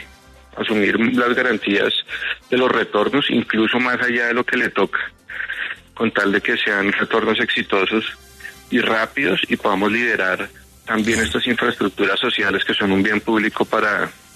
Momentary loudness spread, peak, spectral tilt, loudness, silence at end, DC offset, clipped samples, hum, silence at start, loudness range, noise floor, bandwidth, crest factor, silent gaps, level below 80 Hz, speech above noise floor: 8 LU; -4 dBFS; -4.5 dB/octave; -18 LUFS; 0.2 s; under 0.1%; under 0.1%; none; 0 s; 1 LU; -45 dBFS; 13.5 kHz; 16 dB; none; -52 dBFS; 27 dB